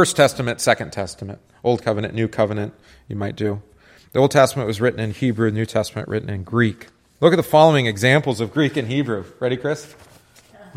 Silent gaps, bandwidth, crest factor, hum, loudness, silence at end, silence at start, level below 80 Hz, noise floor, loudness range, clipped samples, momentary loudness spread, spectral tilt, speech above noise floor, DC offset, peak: none; 16 kHz; 20 dB; none; -20 LUFS; 0.15 s; 0 s; -54 dBFS; -49 dBFS; 5 LU; under 0.1%; 14 LU; -5.5 dB/octave; 30 dB; under 0.1%; 0 dBFS